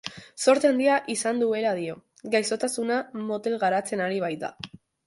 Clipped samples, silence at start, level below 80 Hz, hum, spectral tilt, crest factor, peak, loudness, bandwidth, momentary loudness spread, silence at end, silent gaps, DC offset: under 0.1%; 0.05 s; -70 dBFS; none; -3.5 dB/octave; 18 dB; -8 dBFS; -25 LUFS; 12 kHz; 15 LU; 0.4 s; none; under 0.1%